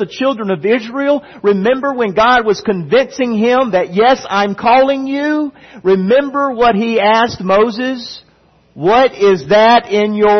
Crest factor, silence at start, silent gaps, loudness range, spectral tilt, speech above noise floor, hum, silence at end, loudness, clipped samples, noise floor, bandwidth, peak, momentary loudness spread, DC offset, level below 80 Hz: 12 dB; 0 s; none; 1 LU; -5.5 dB/octave; 38 dB; none; 0 s; -13 LUFS; under 0.1%; -50 dBFS; 6.4 kHz; 0 dBFS; 7 LU; under 0.1%; -48 dBFS